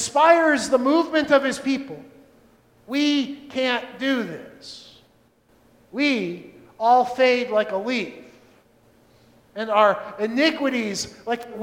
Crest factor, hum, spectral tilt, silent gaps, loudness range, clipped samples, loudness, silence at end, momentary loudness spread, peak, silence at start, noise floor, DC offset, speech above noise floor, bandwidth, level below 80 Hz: 20 dB; none; -3.5 dB/octave; none; 4 LU; under 0.1%; -21 LUFS; 0 s; 19 LU; -2 dBFS; 0 s; -59 dBFS; under 0.1%; 38 dB; 16 kHz; -64 dBFS